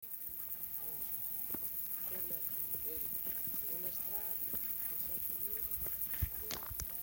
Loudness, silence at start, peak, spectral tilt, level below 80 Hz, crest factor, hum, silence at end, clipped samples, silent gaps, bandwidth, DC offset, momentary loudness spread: -37 LUFS; 0 s; -20 dBFS; -3 dB/octave; -56 dBFS; 20 dB; none; 0 s; under 0.1%; none; 17 kHz; under 0.1%; 4 LU